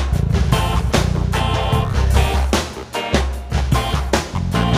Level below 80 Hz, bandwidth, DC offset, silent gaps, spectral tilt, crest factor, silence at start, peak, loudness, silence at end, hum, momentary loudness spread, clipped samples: -22 dBFS; 15.5 kHz; under 0.1%; none; -5.5 dB/octave; 16 dB; 0 s; 0 dBFS; -19 LUFS; 0 s; none; 4 LU; under 0.1%